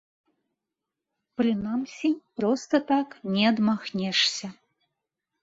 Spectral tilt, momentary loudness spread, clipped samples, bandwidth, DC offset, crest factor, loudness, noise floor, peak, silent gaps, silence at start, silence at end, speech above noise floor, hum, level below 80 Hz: -4.5 dB/octave; 8 LU; under 0.1%; 8 kHz; under 0.1%; 18 dB; -26 LUFS; -86 dBFS; -10 dBFS; none; 1.4 s; 0.9 s; 61 dB; none; -68 dBFS